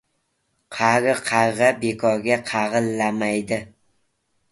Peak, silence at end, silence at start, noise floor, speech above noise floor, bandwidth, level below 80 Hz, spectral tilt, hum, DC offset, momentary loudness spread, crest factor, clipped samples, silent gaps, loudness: -2 dBFS; 0.85 s; 0.7 s; -71 dBFS; 51 dB; 12 kHz; -60 dBFS; -4.5 dB/octave; none; under 0.1%; 7 LU; 20 dB; under 0.1%; none; -21 LUFS